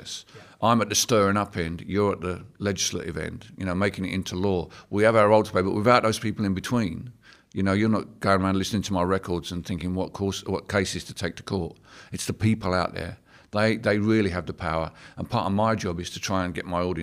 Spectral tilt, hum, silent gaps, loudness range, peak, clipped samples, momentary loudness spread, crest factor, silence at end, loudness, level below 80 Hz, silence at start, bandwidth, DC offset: -5 dB/octave; none; none; 5 LU; -6 dBFS; under 0.1%; 12 LU; 20 dB; 0 s; -25 LUFS; -50 dBFS; 0 s; 16 kHz; under 0.1%